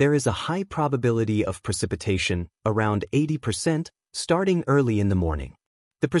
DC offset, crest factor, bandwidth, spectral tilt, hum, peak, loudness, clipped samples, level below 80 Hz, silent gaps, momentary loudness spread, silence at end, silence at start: under 0.1%; 14 dB; 12 kHz; -6 dB/octave; none; -8 dBFS; -25 LUFS; under 0.1%; -46 dBFS; 5.66-5.91 s; 7 LU; 0 s; 0 s